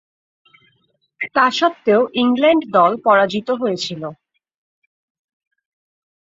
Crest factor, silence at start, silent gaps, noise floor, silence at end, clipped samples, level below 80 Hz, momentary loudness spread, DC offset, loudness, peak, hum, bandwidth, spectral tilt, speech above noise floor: 18 dB; 1.2 s; none; -64 dBFS; 2.15 s; under 0.1%; -66 dBFS; 11 LU; under 0.1%; -16 LUFS; 0 dBFS; none; 7.8 kHz; -5 dB/octave; 48 dB